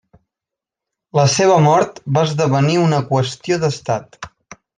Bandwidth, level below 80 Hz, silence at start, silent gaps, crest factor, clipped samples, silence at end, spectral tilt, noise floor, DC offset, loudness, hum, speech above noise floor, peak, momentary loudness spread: 9.8 kHz; -58 dBFS; 1.15 s; none; 14 dB; under 0.1%; 0.5 s; -5.5 dB/octave; -85 dBFS; under 0.1%; -16 LUFS; none; 70 dB; -2 dBFS; 11 LU